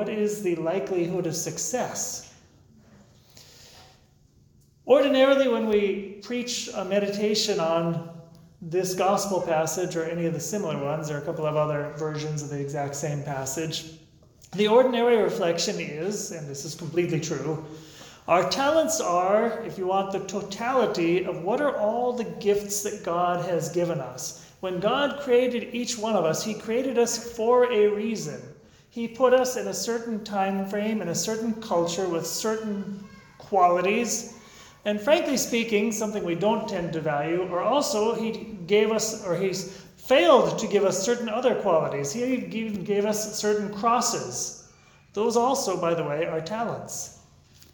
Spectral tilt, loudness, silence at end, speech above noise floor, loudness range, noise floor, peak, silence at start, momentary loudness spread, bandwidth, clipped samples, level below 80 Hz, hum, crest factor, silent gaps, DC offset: -4 dB/octave; -25 LUFS; 0.6 s; 34 dB; 5 LU; -59 dBFS; -4 dBFS; 0 s; 12 LU; 19 kHz; under 0.1%; -62 dBFS; none; 20 dB; none; under 0.1%